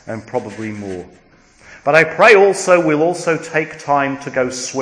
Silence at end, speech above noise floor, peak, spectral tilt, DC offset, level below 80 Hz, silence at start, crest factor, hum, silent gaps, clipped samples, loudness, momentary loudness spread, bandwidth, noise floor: 0 s; 29 dB; 0 dBFS; -4.5 dB/octave; under 0.1%; -56 dBFS; 0.05 s; 16 dB; none; none; 0.1%; -14 LUFS; 18 LU; 10.5 kHz; -44 dBFS